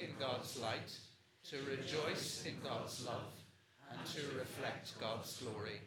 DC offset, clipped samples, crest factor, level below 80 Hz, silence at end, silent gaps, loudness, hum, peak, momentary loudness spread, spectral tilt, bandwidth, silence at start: under 0.1%; under 0.1%; 18 dB; -86 dBFS; 0 s; none; -44 LUFS; none; -28 dBFS; 14 LU; -3.5 dB/octave; 19 kHz; 0 s